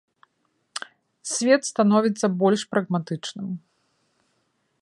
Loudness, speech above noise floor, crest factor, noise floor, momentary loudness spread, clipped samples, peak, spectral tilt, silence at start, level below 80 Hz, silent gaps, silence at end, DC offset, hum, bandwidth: -23 LUFS; 50 dB; 20 dB; -71 dBFS; 17 LU; under 0.1%; -4 dBFS; -5 dB/octave; 0.75 s; -72 dBFS; none; 1.25 s; under 0.1%; none; 11.5 kHz